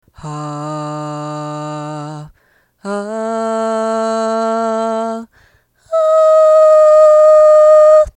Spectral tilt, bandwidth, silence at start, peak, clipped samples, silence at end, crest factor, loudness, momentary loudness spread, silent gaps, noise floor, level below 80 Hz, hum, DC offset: -6 dB/octave; 9.8 kHz; 0.25 s; 0 dBFS; under 0.1%; 0.05 s; 12 dB; -10 LUFS; 19 LU; none; -56 dBFS; -48 dBFS; none; under 0.1%